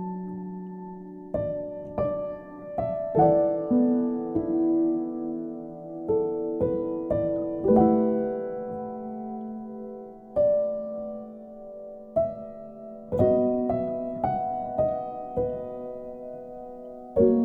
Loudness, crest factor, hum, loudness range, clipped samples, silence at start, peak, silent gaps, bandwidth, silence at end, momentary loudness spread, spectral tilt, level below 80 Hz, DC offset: -27 LUFS; 20 dB; none; 5 LU; under 0.1%; 0 s; -8 dBFS; none; 3.5 kHz; 0 s; 18 LU; -12 dB/octave; -52 dBFS; under 0.1%